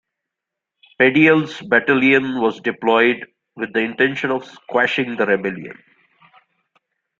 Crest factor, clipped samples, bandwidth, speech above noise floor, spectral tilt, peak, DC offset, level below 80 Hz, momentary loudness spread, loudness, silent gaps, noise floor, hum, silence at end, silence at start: 20 dB; under 0.1%; 7.6 kHz; 66 dB; -6.5 dB/octave; 0 dBFS; under 0.1%; -64 dBFS; 13 LU; -17 LUFS; none; -83 dBFS; none; 1.45 s; 1 s